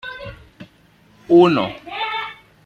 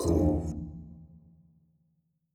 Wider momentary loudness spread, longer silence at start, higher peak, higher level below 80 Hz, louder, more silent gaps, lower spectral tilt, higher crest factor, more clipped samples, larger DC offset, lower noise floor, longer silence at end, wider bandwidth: second, 21 LU vs 24 LU; about the same, 0.05 s vs 0 s; first, -2 dBFS vs -14 dBFS; second, -52 dBFS vs -42 dBFS; first, -17 LUFS vs -30 LUFS; neither; about the same, -7.5 dB/octave vs -8 dB/octave; about the same, 18 dB vs 20 dB; neither; neither; second, -53 dBFS vs -74 dBFS; second, 0.35 s vs 1.3 s; second, 6.6 kHz vs 14 kHz